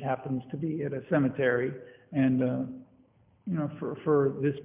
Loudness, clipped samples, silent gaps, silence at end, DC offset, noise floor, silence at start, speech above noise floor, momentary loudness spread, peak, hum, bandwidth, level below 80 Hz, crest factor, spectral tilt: -29 LUFS; under 0.1%; none; 0 s; under 0.1%; -63 dBFS; 0 s; 34 dB; 10 LU; -14 dBFS; none; 3.7 kHz; -66 dBFS; 16 dB; -12 dB/octave